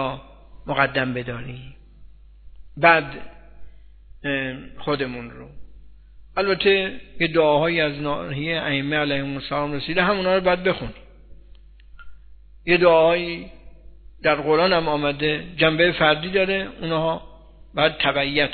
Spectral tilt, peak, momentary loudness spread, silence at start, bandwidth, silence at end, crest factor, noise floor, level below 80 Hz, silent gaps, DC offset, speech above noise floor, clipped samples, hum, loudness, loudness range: -8.5 dB/octave; 0 dBFS; 15 LU; 0 s; 4.6 kHz; 0 s; 22 dB; -46 dBFS; -46 dBFS; none; under 0.1%; 25 dB; under 0.1%; 50 Hz at -45 dBFS; -21 LUFS; 4 LU